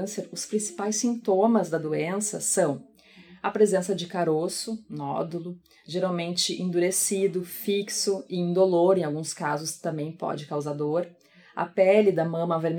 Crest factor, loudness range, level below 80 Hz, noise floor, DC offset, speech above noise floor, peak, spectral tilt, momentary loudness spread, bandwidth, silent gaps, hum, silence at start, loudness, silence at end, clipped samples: 20 dB; 3 LU; -76 dBFS; -52 dBFS; under 0.1%; 26 dB; -6 dBFS; -4.5 dB/octave; 11 LU; 19.5 kHz; none; none; 0 s; -26 LUFS; 0 s; under 0.1%